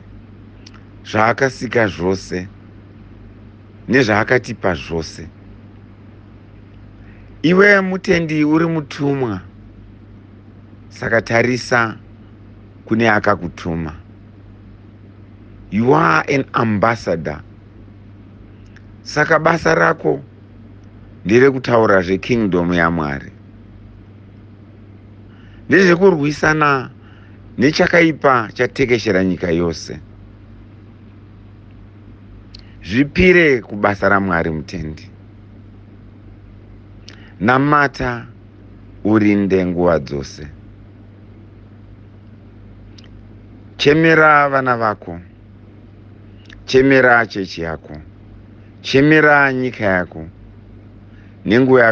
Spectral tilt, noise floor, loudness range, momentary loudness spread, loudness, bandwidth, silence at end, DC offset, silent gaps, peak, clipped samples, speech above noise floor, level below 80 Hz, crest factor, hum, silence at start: -6.5 dB/octave; -41 dBFS; 6 LU; 19 LU; -15 LUFS; 8.4 kHz; 0 s; under 0.1%; none; 0 dBFS; under 0.1%; 26 dB; -44 dBFS; 18 dB; none; 0.05 s